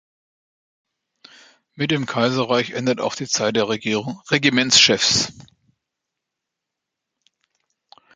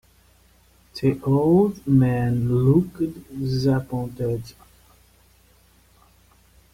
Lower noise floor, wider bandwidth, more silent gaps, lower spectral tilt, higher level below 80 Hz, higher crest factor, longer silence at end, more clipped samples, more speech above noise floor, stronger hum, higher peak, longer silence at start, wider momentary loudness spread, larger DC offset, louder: first, -83 dBFS vs -56 dBFS; second, 9.6 kHz vs 15.5 kHz; neither; second, -2.5 dB/octave vs -9 dB/octave; second, -60 dBFS vs -48 dBFS; about the same, 22 dB vs 18 dB; first, 2.75 s vs 2.25 s; neither; first, 63 dB vs 36 dB; neither; first, 0 dBFS vs -6 dBFS; first, 1.75 s vs 0.95 s; about the same, 11 LU vs 12 LU; neither; first, -18 LUFS vs -22 LUFS